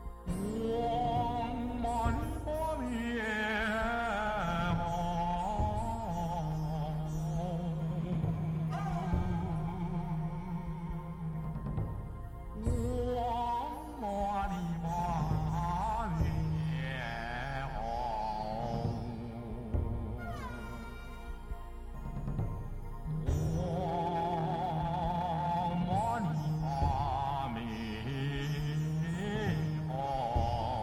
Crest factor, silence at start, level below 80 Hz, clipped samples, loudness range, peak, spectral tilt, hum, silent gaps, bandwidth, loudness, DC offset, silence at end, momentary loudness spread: 18 dB; 0 s; -42 dBFS; under 0.1%; 5 LU; -16 dBFS; -7 dB/octave; none; none; 14.5 kHz; -35 LUFS; under 0.1%; 0 s; 8 LU